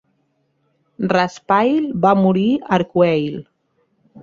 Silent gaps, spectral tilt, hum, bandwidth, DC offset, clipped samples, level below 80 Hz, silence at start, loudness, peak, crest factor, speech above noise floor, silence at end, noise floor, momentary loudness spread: none; -7.5 dB/octave; none; 7.4 kHz; under 0.1%; under 0.1%; -58 dBFS; 1 s; -17 LUFS; -2 dBFS; 16 dB; 50 dB; 0.05 s; -66 dBFS; 8 LU